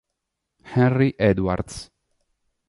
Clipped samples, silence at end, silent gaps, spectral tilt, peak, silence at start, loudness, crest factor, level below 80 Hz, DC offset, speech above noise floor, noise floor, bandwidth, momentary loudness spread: under 0.1%; 0.85 s; none; -7.5 dB/octave; -4 dBFS; 0.65 s; -21 LUFS; 18 dB; -44 dBFS; under 0.1%; 60 dB; -80 dBFS; 11.5 kHz; 14 LU